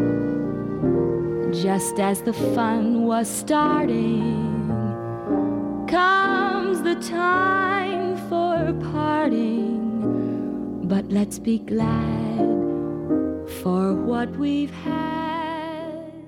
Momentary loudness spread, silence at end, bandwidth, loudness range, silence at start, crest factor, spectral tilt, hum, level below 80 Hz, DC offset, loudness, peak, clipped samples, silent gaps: 7 LU; 0 s; 17 kHz; 3 LU; 0 s; 14 dB; -6 dB/octave; none; -48 dBFS; under 0.1%; -23 LUFS; -8 dBFS; under 0.1%; none